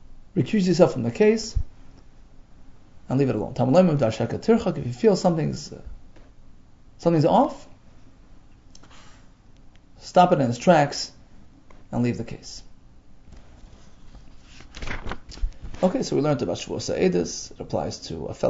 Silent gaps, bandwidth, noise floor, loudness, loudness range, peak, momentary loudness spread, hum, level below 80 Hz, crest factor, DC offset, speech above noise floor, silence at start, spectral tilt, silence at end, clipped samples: none; 8 kHz; -49 dBFS; -23 LUFS; 12 LU; -2 dBFS; 18 LU; none; -42 dBFS; 22 dB; under 0.1%; 27 dB; 0.1 s; -6.5 dB/octave; 0 s; under 0.1%